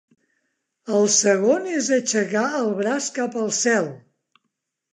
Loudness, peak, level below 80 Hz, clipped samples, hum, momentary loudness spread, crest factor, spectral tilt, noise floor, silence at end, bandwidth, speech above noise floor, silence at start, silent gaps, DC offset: -21 LUFS; -6 dBFS; -78 dBFS; under 0.1%; none; 8 LU; 18 dB; -3 dB/octave; -78 dBFS; 1 s; 11.5 kHz; 57 dB; 0.85 s; none; under 0.1%